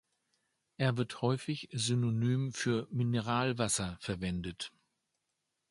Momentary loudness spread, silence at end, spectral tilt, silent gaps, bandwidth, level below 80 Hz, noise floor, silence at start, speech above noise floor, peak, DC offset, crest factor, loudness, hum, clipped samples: 7 LU; 1 s; -5 dB/octave; none; 11.5 kHz; -60 dBFS; -84 dBFS; 0.8 s; 51 dB; -16 dBFS; under 0.1%; 20 dB; -34 LUFS; none; under 0.1%